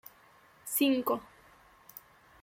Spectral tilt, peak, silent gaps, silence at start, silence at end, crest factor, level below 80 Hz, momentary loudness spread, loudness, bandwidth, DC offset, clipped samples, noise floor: -2.5 dB/octave; -16 dBFS; none; 0.65 s; 1.15 s; 18 dB; -72 dBFS; 24 LU; -30 LUFS; 16.5 kHz; under 0.1%; under 0.1%; -61 dBFS